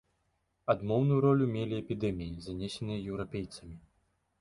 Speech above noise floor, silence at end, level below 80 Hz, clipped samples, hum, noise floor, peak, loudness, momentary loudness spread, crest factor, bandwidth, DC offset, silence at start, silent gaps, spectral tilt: 46 dB; 0.6 s; -56 dBFS; under 0.1%; none; -77 dBFS; -14 dBFS; -32 LUFS; 14 LU; 18 dB; 11 kHz; under 0.1%; 0.65 s; none; -8 dB/octave